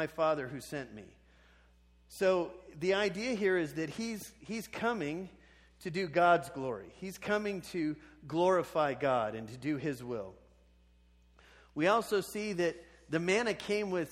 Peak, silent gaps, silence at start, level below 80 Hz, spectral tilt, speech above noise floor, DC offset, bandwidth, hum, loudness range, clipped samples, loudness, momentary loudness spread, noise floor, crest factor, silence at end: -14 dBFS; none; 0 s; -64 dBFS; -5 dB/octave; 31 dB; under 0.1%; 16 kHz; none; 3 LU; under 0.1%; -34 LUFS; 13 LU; -64 dBFS; 20 dB; 0 s